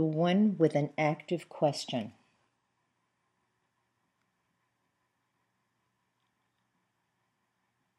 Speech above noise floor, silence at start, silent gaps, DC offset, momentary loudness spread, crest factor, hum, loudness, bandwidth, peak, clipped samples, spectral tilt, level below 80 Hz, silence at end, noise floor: 50 dB; 0 s; none; under 0.1%; 11 LU; 22 dB; none; -30 LUFS; 12 kHz; -12 dBFS; under 0.1%; -6.5 dB/octave; -90 dBFS; 5.9 s; -79 dBFS